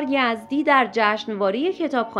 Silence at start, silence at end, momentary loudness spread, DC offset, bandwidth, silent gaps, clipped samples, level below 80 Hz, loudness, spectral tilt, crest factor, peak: 0 s; 0 s; 6 LU; under 0.1%; 11.5 kHz; none; under 0.1%; -70 dBFS; -21 LUFS; -5 dB/octave; 18 dB; -4 dBFS